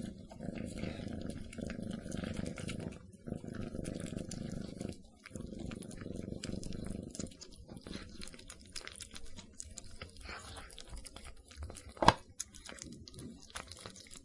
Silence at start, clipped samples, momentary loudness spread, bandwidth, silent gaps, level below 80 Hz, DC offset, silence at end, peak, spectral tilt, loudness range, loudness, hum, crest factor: 0 s; under 0.1%; 9 LU; 11.5 kHz; none; -54 dBFS; under 0.1%; 0 s; -4 dBFS; -4.5 dB/octave; 10 LU; -43 LUFS; none; 38 dB